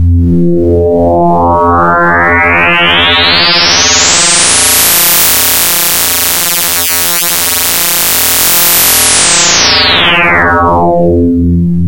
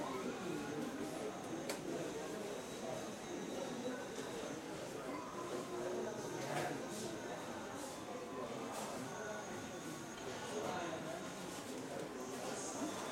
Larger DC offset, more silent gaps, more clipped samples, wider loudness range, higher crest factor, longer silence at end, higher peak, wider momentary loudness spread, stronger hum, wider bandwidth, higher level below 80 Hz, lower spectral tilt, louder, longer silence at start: neither; neither; first, 0.1% vs under 0.1%; about the same, 2 LU vs 1 LU; second, 8 dB vs 18 dB; about the same, 0 s vs 0 s; first, 0 dBFS vs -28 dBFS; about the same, 4 LU vs 4 LU; neither; about the same, 17.5 kHz vs 16.5 kHz; first, -26 dBFS vs -74 dBFS; second, -2.5 dB/octave vs -4 dB/octave; first, -5 LUFS vs -45 LUFS; about the same, 0 s vs 0 s